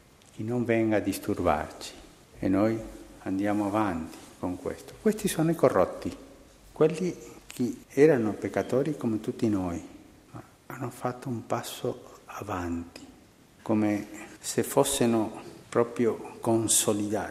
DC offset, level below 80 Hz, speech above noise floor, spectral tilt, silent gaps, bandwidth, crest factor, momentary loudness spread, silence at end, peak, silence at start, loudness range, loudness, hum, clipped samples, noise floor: under 0.1%; -56 dBFS; 28 dB; -5 dB/octave; none; 15.5 kHz; 22 dB; 18 LU; 0 s; -6 dBFS; 0.35 s; 7 LU; -28 LUFS; none; under 0.1%; -56 dBFS